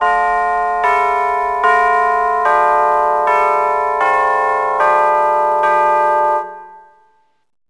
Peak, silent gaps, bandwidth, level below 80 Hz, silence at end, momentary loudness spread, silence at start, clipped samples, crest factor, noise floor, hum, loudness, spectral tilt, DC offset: 0 dBFS; none; 11 kHz; -48 dBFS; 0.9 s; 3 LU; 0 s; under 0.1%; 14 dB; -56 dBFS; none; -14 LUFS; -3.5 dB/octave; 0.2%